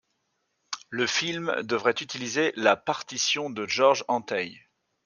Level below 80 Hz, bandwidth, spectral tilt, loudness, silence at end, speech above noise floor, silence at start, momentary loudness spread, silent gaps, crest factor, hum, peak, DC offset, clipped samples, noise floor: -76 dBFS; 10 kHz; -2.5 dB/octave; -26 LUFS; 0.45 s; 50 dB; 0.7 s; 9 LU; none; 20 dB; none; -8 dBFS; under 0.1%; under 0.1%; -76 dBFS